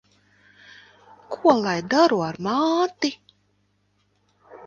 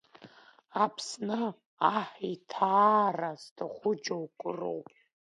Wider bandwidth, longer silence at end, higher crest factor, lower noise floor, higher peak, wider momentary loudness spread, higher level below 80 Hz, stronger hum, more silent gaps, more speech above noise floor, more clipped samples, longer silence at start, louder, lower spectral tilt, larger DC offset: second, 7.4 kHz vs 11 kHz; second, 0 s vs 0.5 s; about the same, 22 dB vs 22 dB; first, -67 dBFS vs -57 dBFS; first, -2 dBFS vs -10 dBFS; second, 9 LU vs 14 LU; first, -68 dBFS vs -82 dBFS; first, 50 Hz at -55 dBFS vs none; second, none vs 1.66-1.77 s, 3.51-3.56 s; first, 47 dB vs 27 dB; neither; first, 1.3 s vs 0.2 s; first, -21 LUFS vs -31 LUFS; about the same, -5 dB/octave vs -5 dB/octave; neither